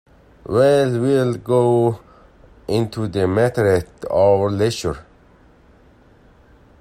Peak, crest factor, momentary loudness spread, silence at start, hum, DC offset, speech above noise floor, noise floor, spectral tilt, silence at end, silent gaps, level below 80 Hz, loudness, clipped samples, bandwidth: -2 dBFS; 16 dB; 11 LU; 0.5 s; none; under 0.1%; 33 dB; -50 dBFS; -7 dB/octave; 1.8 s; none; -48 dBFS; -18 LUFS; under 0.1%; 15.5 kHz